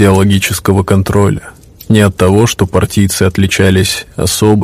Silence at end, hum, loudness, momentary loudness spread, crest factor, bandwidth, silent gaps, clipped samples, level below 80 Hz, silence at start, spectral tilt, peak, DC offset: 0 s; none; -10 LUFS; 5 LU; 10 dB; 16 kHz; none; 1%; -32 dBFS; 0 s; -5.5 dB/octave; 0 dBFS; 0.2%